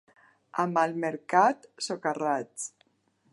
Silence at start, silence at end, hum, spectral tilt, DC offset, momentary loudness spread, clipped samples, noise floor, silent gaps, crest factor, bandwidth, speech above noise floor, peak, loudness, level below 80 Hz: 0.55 s; 0.65 s; none; -4 dB/octave; under 0.1%; 14 LU; under 0.1%; -70 dBFS; none; 22 dB; 11.5 kHz; 42 dB; -8 dBFS; -28 LUFS; -84 dBFS